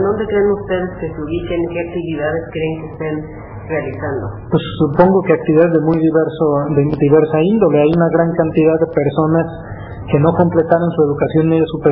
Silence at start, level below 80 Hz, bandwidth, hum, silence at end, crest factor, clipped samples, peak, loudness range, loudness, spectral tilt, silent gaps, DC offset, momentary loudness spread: 0 s; -38 dBFS; 5 kHz; none; 0 s; 14 dB; under 0.1%; 0 dBFS; 8 LU; -15 LUFS; -12.5 dB/octave; none; under 0.1%; 11 LU